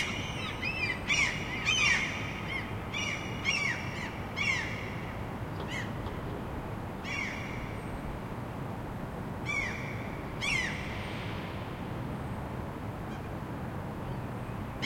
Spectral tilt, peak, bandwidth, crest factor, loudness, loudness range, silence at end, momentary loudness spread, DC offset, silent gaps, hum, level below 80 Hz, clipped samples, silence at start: -4 dB/octave; -14 dBFS; 16.5 kHz; 20 dB; -34 LUFS; 8 LU; 0 s; 11 LU; under 0.1%; none; none; -48 dBFS; under 0.1%; 0 s